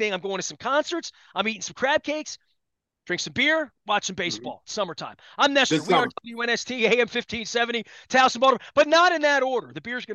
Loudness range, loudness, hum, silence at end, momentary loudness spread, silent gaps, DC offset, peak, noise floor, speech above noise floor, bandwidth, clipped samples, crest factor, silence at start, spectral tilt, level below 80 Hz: 6 LU; -23 LUFS; none; 0 s; 13 LU; none; under 0.1%; -6 dBFS; -82 dBFS; 58 dB; 10 kHz; under 0.1%; 18 dB; 0 s; -2.5 dB/octave; -64 dBFS